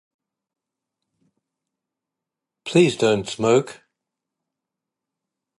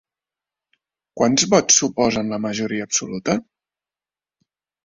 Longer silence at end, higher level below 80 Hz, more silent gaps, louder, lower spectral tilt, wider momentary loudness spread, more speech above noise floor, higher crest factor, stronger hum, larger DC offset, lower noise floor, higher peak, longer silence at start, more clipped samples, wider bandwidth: first, 1.85 s vs 1.45 s; second, -64 dBFS vs -56 dBFS; neither; about the same, -19 LUFS vs -19 LUFS; first, -5.5 dB/octave vs -3 dB/octave; first, 15 LU vs 10 LU; second, 67 dB vs over 71 dB; about the same, 22 dB vs 20 dB; neither; neither; second, -86 dBFS vs under -90 dBFS; about the same, -4 dBFS vs -2 dBFS; first, 2.65 s vs 1.15 s; neither; first, 11.5 kHz vs 7.8 kHz